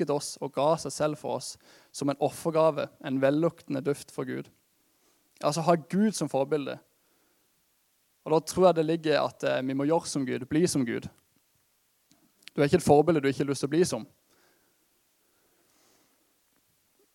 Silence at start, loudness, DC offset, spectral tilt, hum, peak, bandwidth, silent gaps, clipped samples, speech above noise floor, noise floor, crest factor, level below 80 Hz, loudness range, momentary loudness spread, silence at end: 0 s; -28 LUFS; under 0.1%; -5.5 dB/octave; none; -8 dBFS; 17 kHz; none; under 0.1%; 44 dB; -70 dBFS; 22 dB; -66 dBFS; 3 LU; 14 LU; 3.1 s